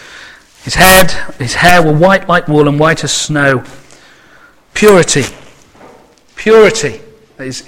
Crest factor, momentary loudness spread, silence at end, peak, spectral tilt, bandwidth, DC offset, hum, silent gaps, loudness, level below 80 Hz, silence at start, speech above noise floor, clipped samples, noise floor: 10 dB; 14 LU; 0 s; 0 dBFS; -4 dB/octave; over 20 kHz; under 0.1%; none; none; -9 LUFS; -32 dBFS; 0 s; 34 dB; 1%; -42 dBFS